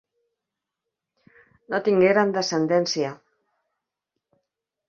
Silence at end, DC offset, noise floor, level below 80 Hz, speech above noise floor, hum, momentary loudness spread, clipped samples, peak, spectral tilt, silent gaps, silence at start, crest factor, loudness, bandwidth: 1.75 s; under 0.1%; -85 dBFS; -70 dBFS; 64 dB; none; 10 LU; under 0.1%; -6 dBFS; -5 dB/octave; none; 1.7 s; 20 dB; -22 LUFS; 7.4 kHz